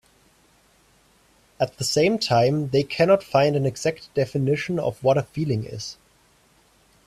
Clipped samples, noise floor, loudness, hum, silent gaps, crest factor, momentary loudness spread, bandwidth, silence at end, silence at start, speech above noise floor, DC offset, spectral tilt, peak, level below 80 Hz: under 0.1%; -59 dBFS; -22 LUFS; none; none; 18 dB; 9 LU; 14 kHz; 1.15 s; 1.6 s; 37 dB; under 0.1%; -5.5 dB/octave; -6 dBFS; -58 dBFS